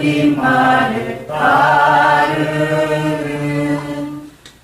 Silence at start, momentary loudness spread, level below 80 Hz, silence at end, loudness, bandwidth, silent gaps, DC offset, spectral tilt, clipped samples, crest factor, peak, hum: 0 s; 12 LU; -48 dBFS; 0.15 s; -14 LUFS; 15.5 kHz; none; under 0.1%; -6 dB/octave; under 0.1%; 14 dB; -2 dBFS; none